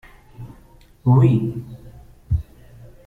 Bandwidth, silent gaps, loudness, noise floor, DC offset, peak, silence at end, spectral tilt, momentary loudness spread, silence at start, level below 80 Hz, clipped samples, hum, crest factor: 4 kHz; none; -19 LUFS; -49 dBFS; under 0.1%; -4 dBFS; 0.65 s; -10.5 dB/octave; 26 LU; 0.4 s; -38 dBFS; under 0.1%; none; 18 dB